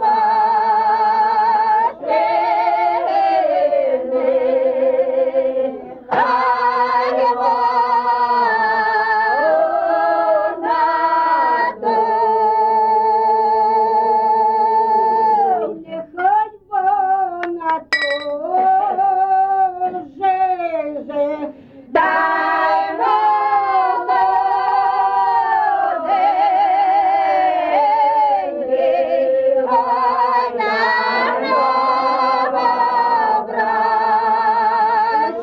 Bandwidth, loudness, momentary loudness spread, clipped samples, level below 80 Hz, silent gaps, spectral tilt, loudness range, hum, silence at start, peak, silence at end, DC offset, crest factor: 8.2 kHz; -16 LUFS; 5 LU; under 0.1%; -60 dBFS; none; -5 dB/octave; 2 LU; none; 0 s; -4 dBFS; 0 s; under 0.1%; 12 dB